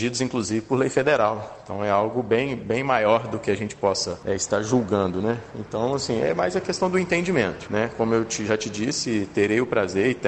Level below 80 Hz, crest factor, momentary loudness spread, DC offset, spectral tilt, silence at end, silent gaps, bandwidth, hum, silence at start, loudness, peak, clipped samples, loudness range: -54 dBFS; 18 dB; 6 LU; under 0.1%; -4.5 dB/octave; 0 s; none; 9 kHz; none; 0 s; -23 LUFS; -4 dBFS; under 0.1%; 1 LU